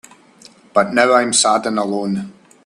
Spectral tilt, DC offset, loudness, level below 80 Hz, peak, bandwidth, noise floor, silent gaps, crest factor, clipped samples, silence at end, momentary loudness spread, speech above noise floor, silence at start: -3 dB/octave; under 0.1%; -16 LUFS; -60 dBFS; 0 dBFS; 12.5 kHz; -46 dBFS; none; 18 dB; under 0.1%; 0.35 s; 11 LU; 31 dB; 0.75 s